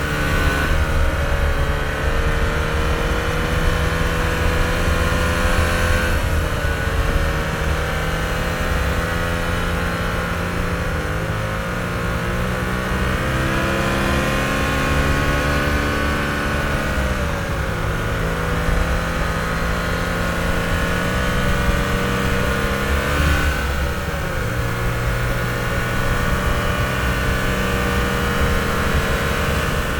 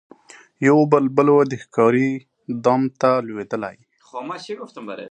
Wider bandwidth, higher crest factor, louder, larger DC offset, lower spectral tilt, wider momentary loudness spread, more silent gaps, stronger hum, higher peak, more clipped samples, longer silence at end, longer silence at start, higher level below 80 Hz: first, 19.5 kHz vs 9.2 kHz; second, 14 dB vs 20 dB; about the same, -20 LUFS vs -18 LUFS; neither; second, -5 dB/octave vs -7.5 dB/octave; second, 4 LU vs 17 LU; neither; neither; second, -4 dBFS vs 0 dBFS; neither; about the same, 0 s vs 0 s; second, 0 s vs 0.6 s; first, -24 dBFS vs -68 dBFS